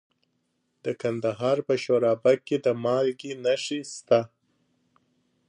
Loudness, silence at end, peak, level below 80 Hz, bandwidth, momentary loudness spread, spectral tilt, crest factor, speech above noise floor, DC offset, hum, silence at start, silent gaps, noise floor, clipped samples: -26 LUFS; 1.25 s; -8 dBFS; -74 dBFS; 10.5 kHz; 9 LU; -5.5 dB/octave; 20 dB; 49 dB; under 0.1%; none; 0.85 s; none; -74 dBFS; under 0.1%